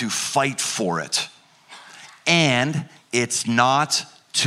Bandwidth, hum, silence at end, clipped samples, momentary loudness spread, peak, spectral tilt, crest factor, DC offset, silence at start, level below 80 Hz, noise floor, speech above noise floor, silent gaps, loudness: 15.5 kHz; none; 0 s; under 0.1%; 8 LU; -4 dBFS; -3 dB/octave; 20 dB; under 0.1%; 0 s; -66 dBFS; -47 dBFS; 26 dB; none; -21 LUFS